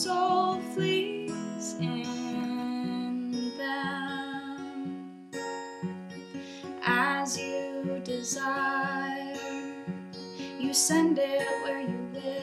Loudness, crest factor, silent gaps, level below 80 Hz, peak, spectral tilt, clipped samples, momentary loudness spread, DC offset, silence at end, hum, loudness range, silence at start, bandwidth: -31 LUFS; 18 dB; none; -78 dBFS; -12 dBFS; -3.5 dB/octave; under 0.1%; 14 LU; under 0.1%; 0 s; none; 6 LU; 0 s; 16 kHz